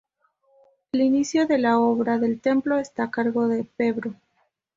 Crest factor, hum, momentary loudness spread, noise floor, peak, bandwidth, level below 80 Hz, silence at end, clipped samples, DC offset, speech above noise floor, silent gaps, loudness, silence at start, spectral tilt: 16 dB; none; 7 LU; -70 dBFS; -8 dBFS; 7.6 kHz; -66 dBFS; 0.6 s; under 0.1%; under 0.1%; 48 dB; none; -23 LUFS; 0.95 s; -5.5 dB/octave